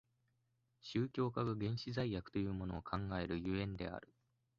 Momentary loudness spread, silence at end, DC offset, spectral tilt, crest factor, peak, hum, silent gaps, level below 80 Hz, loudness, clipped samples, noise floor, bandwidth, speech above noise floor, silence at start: 7 LU; 0.55 s; under 0.1%; -6 dB/octave; 18 dB; -24 dBFS; none; none; -60 dBFS; -41 LUFS; under 0.1%; -81 dBFS; 7.4 kHz; 41 dB; 0.85 s